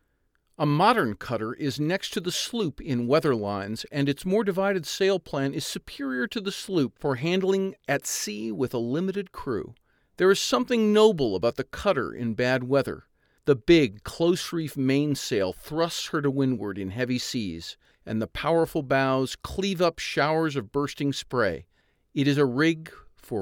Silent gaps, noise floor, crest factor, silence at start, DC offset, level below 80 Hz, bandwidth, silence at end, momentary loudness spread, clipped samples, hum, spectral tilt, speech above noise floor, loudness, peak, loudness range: none; -71 dBFS; 20 dB; 0.6 s; under 0.1%; -54 dBFS; 18 kHz; 0 s; 10 LU; under 0.1%; none; -5 dB/octave; 45 dB; -26 LUFS; -6 dBFS; 4 LU